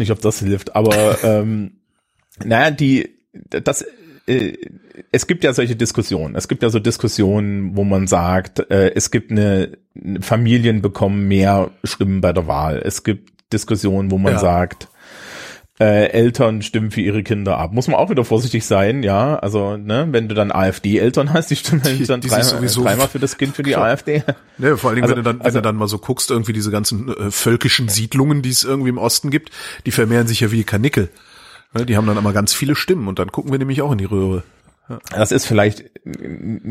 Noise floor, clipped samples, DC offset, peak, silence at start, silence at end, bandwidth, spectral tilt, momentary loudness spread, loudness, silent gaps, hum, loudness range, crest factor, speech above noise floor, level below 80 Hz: -65 dBFS; under 0.1%; under 0.1%; 0 dBFS; 0 s; 0 s; 16 kHz; -5 dB/octave; 11 LU; -17 LUFS; none; none; 3 LU; 16 dB; 49 dB; -44 dBFS